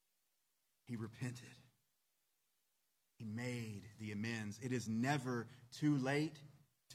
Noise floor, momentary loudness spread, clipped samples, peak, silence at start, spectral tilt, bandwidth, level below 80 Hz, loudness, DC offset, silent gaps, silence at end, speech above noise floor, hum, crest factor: -85 dBFS; 15 LU; under 0.1%; -24 dBFS; 0.9 s; -6 dB/octave; 15.5 kHz; -84 dBFS; -42 LUFS; under 0.1%; none; 0 s; 43 dB; none; 20 dB